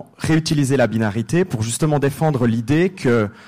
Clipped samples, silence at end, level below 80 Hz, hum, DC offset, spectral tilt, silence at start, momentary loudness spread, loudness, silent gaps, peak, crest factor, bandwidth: under 0.1%; 0 s; -46 dBFS; none; 0.4%; -6 dB/octave; 0 s; 3 LU; -18 LUFS; none; -6 dBFS; 12 dB; 15.5 kHz